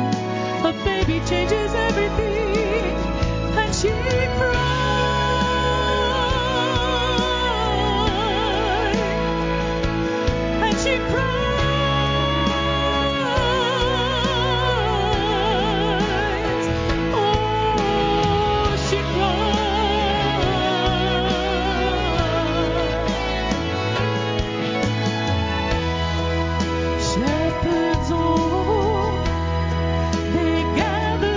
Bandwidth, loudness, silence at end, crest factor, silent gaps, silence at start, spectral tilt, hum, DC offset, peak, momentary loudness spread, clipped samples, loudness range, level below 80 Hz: 7.6 kHz; -21 LUFS; 0 s; 14 dB; none; 0 s; -5.5 dB/octave; none; under 0.1%; -6 dBFS; 3 LU; under 0.1%; 2 LU; -30 dBFS